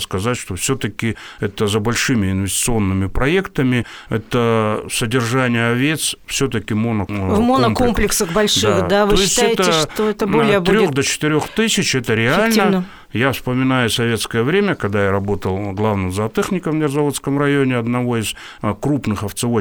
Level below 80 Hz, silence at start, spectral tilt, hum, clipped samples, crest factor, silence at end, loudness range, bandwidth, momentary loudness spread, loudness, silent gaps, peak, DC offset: -36 dBFS; 0 s; -4.5 dB/octave; none; under 0.1%; 14 dB; 0 s; 4 LU; over 20 kHz; 7 LU; -17 LUFS; none; -2 dBFS; under 0.1%